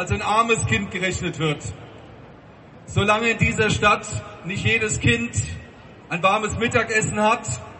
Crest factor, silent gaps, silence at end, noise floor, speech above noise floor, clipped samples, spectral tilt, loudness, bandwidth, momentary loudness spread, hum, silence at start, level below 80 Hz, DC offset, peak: 20 dB; none; 0 s; -45 dBFS; 23 dB; under 0.1%; -4 dB/octave; -21 LUFS; 8.6 kHz; 12 LU; none; 0 s; -40 dBFS; under 0.1%; -2 dBFS